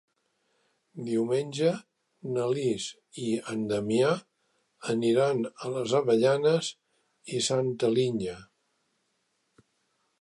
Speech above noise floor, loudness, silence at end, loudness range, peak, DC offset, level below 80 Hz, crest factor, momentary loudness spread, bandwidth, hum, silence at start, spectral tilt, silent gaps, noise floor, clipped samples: 48 dB; -28 LUFS; 1.75 s; 5 LU; -12 dBFS; under 0.1%; -70 dBFS; 18 dB; 13 LU; 11.5 kHz; none; 0.95 s; -5 dB/octave; none; -76 dBFS; under 0.1%